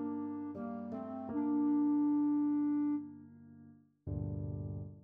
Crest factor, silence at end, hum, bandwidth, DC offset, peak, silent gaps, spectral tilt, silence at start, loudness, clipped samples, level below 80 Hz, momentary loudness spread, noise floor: 10 dB; 0.05 s; none; 2.2 kHz; under 0.1%; -26 dBFS; none; -12 dB/octave; 0 s; -36 LUFS; under 0.1%; -58 dBFS; 13 LU; -60 dBFS